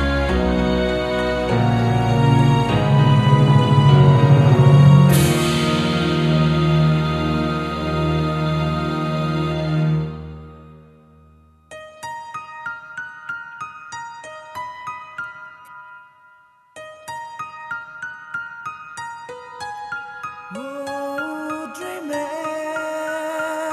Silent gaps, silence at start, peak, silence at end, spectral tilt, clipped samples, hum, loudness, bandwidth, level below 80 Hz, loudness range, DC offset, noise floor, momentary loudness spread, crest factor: none; 0 s; -2 dBFS; 0 s; -7 dB/octave; under 0.1%; none; -18 LUFS; 13 kHz; -36 dBFS; 20 LU; under 0.1%; -52 dBFS; 20 LU; 18 dB